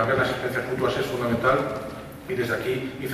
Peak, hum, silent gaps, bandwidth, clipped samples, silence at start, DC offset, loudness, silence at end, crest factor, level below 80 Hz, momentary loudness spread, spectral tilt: -8 dBFS; none; none; 15.5 kHz; under 0.1%; 0 s; under 0.1%; -25 LUFS; 0 s; 16 dB; -50 dBFS; 10 LU; -6 dB/octave